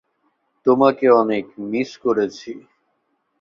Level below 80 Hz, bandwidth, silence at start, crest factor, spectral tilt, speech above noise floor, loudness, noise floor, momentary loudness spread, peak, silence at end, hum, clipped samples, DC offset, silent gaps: -64 dBFS; 7.2 kHz; 0.65 s; 18 dB; -6.5 dB/octave; 52 dB; -19 LUFS; -70 dBFS; 18 LU; -2 dBFS; 0.8 s; none; under 0.1%; under 0.1%; none